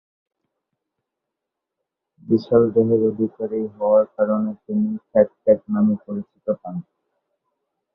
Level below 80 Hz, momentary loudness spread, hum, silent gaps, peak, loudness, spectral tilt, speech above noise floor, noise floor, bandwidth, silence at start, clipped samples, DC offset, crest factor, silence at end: -60 dBFS; 10 LU; none; none; -2 dBFS; -20 LUFS; -11.5 dB/octave; 64 dB; -83 dBFS; 5.4 kHz; 2.25 s; under 0.1%; under 0.1%; 20 dB; 1.15 s